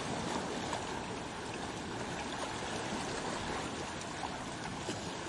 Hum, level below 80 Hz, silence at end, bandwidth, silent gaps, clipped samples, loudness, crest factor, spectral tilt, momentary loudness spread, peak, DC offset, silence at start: none; -58 dBFS; 0 s; 11.5 kHz; none; under 0.1%; -39 LUFS; 18 dB; -3.5 dB/octave; 3 LU; -22 dBFS; under 0.1%; 0 s